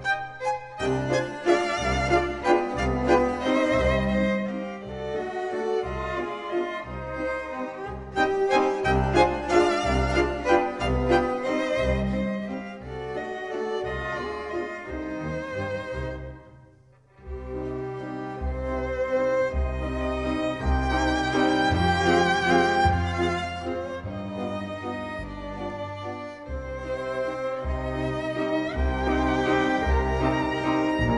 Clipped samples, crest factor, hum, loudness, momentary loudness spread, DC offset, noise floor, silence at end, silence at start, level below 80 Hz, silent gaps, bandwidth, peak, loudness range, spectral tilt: under 0.1%; 20 dB; none; -26 LUFS; 12 LU; under 0.1%; -56 dBFS; 0 s; 0 s; -36 dBFS; none; 10.5 kHz; -6 dBFS; 10 LU; -6 dB/octave